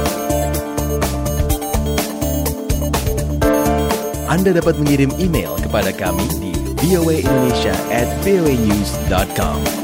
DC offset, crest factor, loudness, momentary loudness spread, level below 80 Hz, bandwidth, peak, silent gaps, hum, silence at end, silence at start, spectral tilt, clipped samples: under 0.1%; 14 dB; -17 LUFS; 5 LU; -26 dBFS; 16.5 kHz; -2 dBFS; none; none; 0 s; 0 s; -5.5 dB/octave; under 0.1%